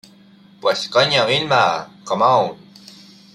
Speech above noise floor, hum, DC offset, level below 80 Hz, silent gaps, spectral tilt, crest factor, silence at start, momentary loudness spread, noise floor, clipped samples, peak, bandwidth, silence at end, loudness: 31 dB; none; under 0.1%; -62 dBFS; none; -3.5 dB/octave; 18 dB; 0.65 s; 10 LU; -48 dBFS; under 0.1%; -2 dBFS; 13.5 kHz; 0.8 s; -17 LUFS